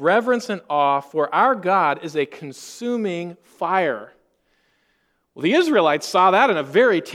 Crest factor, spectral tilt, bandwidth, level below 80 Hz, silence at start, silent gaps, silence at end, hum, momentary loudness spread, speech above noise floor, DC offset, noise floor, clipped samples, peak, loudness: 18 dB; -4.5 dB/octave; 15 kHz; -74 dBFS; 0 s; none; 0 s; none; 13 LU; 48 dB; under 0.1%; -67 dBFS; under 0.1%; -2 dBFS; -19 LUFS